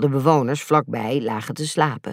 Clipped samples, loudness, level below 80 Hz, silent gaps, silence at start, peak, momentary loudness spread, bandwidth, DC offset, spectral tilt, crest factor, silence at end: under 0.1%; -21 LUFS; -70 dBFS; none; 0 s; -4 dBFS; 8 LU; 16 kHz; under 0.1%; -6 dB/octave; 18 dB; 0 s